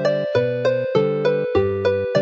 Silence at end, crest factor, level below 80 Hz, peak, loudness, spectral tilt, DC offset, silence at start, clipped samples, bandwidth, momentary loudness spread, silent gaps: 0 s; 14 dB; -50 dBFS; -4 dBFS; -20 LUFS; -7 dB/octave; under 0.1%; 0 s; under 0.1%; 7.2 kHz; 1 LU; none